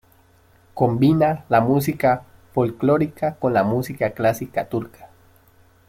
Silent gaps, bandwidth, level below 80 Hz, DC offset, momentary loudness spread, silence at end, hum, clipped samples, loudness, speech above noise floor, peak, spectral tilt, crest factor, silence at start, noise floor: none; 16.5 kHz; -54 dBFS; under 0.1%; 10 LU; 0.8 s; none; under 0.1%; -21 LUFS; 35 dB; -2 dBFS; -7.5 dB/octave; 18 dB; 0.75 s; -55 dBFS